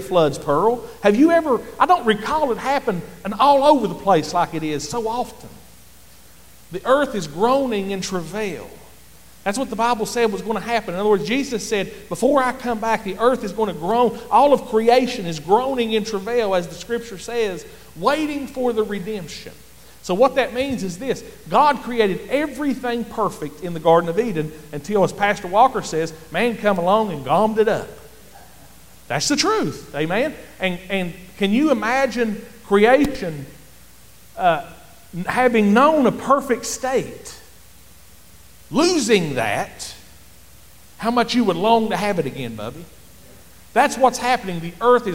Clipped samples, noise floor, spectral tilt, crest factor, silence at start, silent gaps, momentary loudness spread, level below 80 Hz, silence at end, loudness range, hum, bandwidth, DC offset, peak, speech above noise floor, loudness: under 0.1%; -48 dBFS; -4.5 dB/octave; 18 dB; 0 s; none; 13 LU; -50 dBFS; 0 s; 5 LU; none; 17 kHz; 0.8%; -2 dBFS; 29 dB; -20 LUFS